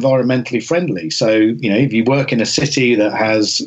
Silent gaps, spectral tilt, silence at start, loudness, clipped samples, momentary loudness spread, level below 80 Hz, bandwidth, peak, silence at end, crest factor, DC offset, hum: none; -5 dB/octave; 0 s; -15 LUFS; under 0.1%; 4 LU; -54 dBFS; 8.4 kHz; -4 dBFS; 0 s; 12 dB; under 0.1%; none